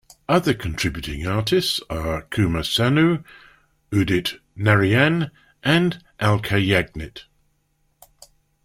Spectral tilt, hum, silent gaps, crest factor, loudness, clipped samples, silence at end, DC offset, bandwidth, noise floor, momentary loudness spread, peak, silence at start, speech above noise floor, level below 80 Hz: -5.5 dB/octave; none; none; 20 dB; -21 LUFS; under 0.1%; 1.45 s; under 0.1%; 16 kHz; -67 dBFS; 10 LU; -2 dBFS; 0.3 s; 46 dB; -42 dBFS